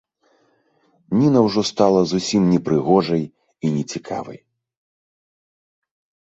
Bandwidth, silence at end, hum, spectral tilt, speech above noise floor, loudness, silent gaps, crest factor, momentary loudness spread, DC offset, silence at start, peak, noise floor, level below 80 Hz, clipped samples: 8.2 kHz; 1.95 s; none; -6.5 dB/octave; 44 dB; -19 LUFS; none; 18 dB; 13 LU; under 0.1%; 1.1 s; -2 dBFS; -62 dBFS; -56 dBFS; under 0.1%